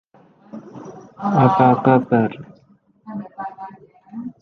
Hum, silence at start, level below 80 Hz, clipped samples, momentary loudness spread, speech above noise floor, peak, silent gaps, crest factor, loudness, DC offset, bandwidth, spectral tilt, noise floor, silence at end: none; 0.55 s; -60 dBFS; under 0.1%; 25 LU; 40 dB; -2 dBFS; none; 18 dB; -17 LUFS; under 0.1%; 6.2 kHz; -9.5 dB/octave; -55 dBFS; 0.1 s